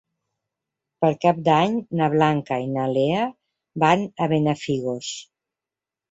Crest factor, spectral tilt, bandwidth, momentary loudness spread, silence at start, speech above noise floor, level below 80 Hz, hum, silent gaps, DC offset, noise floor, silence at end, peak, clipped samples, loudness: 20 dB; -6 dB/octave; 8 kHz; 10 LU; 1 s; 68 dB; -62 dBFS; none; none; under 0.1%; -89 dBFS; 0.9 s; -2 dBFS; under 0.1%; -22 LUFS